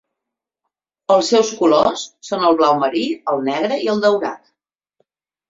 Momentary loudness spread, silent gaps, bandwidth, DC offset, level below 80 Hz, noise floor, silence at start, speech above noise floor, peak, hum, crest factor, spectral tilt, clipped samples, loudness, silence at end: 12 LU; none; 7.8 kHz; under 0.1%; -60 dBFS; -83 dBFS; 1.1 s; 67 dB; -2 dBFS; none; 16 dB; -4 dB/octave; under 0.1%; -17 LUFS; 1.15 s